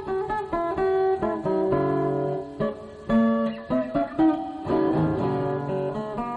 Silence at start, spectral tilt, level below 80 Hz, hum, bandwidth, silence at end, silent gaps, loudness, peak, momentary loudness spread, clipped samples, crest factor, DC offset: 0 s; -9 dB/octave; -50 dBFS; none; 8.4 kHz; 0 s; none; -25 LUFS; -12 dBFS; 7 LU; under 0.1%; 14 dB; under 0.1%